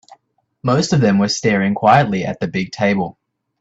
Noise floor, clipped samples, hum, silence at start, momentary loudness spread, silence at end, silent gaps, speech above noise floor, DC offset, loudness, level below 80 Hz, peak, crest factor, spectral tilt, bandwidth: -62 dBFS; under 0.1%; none; 0.1 s; 9 LU; 0.5 s; none; 46 dB; under 0.1%; -16 LUFS; -52 dBFS; 0 dBFS; 16 dB; -5.5 dB/octave; 8 kHz